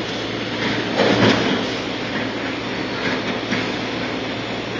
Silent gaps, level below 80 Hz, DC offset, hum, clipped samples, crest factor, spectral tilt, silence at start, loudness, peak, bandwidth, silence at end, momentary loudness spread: none; -48 dBFS; under 0.1%; none; under 0.1%; 18 dB; -5 dB/octave; 0 s; -21 LUFS; -2 dBFS; 7.8 kHz; 0 s; 9 LU